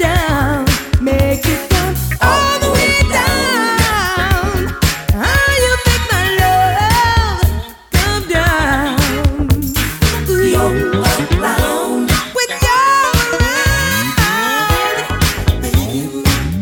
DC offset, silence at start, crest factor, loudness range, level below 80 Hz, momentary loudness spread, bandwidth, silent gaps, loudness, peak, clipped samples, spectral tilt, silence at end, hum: under 0.1%; 0 s; 14 dB; 2 LU; -22 dBFS; 5 LU; over 20 kHz; none; -13 LUFS; 0 dBFS; under 0.1%; -4 dB/octave; 0 s; none